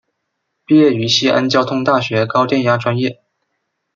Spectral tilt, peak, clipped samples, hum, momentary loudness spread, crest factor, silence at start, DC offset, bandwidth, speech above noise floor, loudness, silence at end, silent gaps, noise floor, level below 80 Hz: -5 dB/octave; 0 dBFS; under 0.1%; none; 5 LU; 14 dB; 0.7 s; under 0.1%; 7.6 kHz; 59 dB; -14 LUFS; 0.8 s; none; -73 dBFS; -60 dBFS